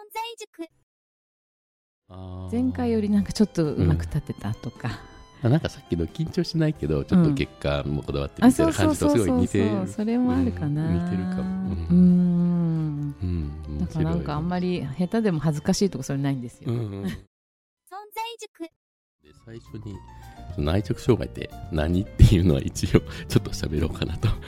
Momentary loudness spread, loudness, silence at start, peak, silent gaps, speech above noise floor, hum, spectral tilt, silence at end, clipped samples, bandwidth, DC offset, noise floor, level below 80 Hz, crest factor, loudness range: 19 LU; -24 LUFS; 0 s; 0 dBFS; 0.47-0.53 s, 0.83-2.02 s, 17.27-17.77 s, 18.48-18.54 s, 18.76-19.19 s; over 67 dB; none; -7 dB/octave; 0 s; under 0.1%; 15.5 kHz; under 0.1%; under -90 dBFS; -36 dBFS; 24 dB; 10 LU